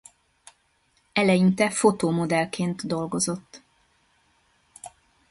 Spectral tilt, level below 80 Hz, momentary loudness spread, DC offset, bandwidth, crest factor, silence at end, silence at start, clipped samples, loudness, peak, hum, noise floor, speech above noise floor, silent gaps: -5 dB/octave; -62 dBFS; 24 LU; under 0.1%; 11.5 kHz; 20 dB; 0.4 s; 1.15 s; under 0.1%; -23 LUFS; -6 dBFS; none; -67 dBFS; 44 dB; none